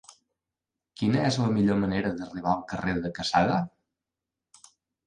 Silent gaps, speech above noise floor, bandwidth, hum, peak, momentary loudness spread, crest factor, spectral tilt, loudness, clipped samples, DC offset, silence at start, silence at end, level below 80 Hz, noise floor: none; 62 dB; 10.5 kHz; none; -8 dBFS; 7 LU; 20 dB; -6 dB/octave; -27 LUFS; under 0.1%; under 0.1%; 1 s; 1.4 s; -54 dBFS; -88 dBFS